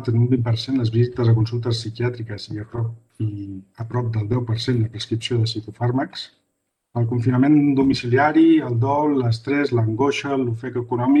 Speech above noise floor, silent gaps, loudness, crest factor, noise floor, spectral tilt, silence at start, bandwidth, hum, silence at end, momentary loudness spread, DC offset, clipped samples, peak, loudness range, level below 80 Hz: 55 dB; none; -21 LUFS; 14 dB; -75 dBFS; -7.5 dB/octave; 0 s; 9.2 kHz; none; 0 s; 14 LU; under 0.1%; under 0.1%; -6 dBFS; 7 LU; -52 dBFS